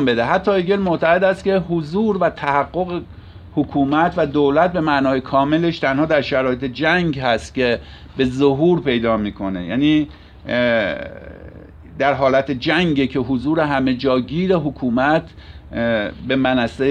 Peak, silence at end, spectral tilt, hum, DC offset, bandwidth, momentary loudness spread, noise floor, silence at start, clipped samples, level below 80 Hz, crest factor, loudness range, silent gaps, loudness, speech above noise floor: -2 dBFS; 0 s; -7 dB/octave; none; under 0.1%; 9.6 kHz; 9 LU; -38 dBFS; 0 s; under 0.1%; -42 dBFS; 16 dB; 2 LU; none; -18 LUFS; 21 dB